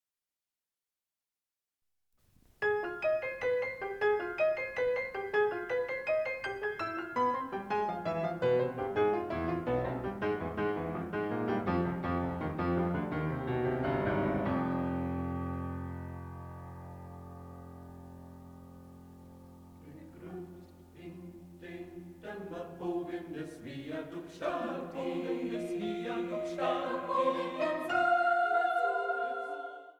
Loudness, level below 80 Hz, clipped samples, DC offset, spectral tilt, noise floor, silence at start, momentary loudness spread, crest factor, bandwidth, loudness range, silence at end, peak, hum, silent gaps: -33 LUFS; -58 dBFS; under 0.1%; under 0.1%; -7.5 dB/octave; under -90 dBFS; 2.6 s; 19 LU; 18 dB; 19 kHz; 17 LU; 0.1 s; -16 dBFS; none; none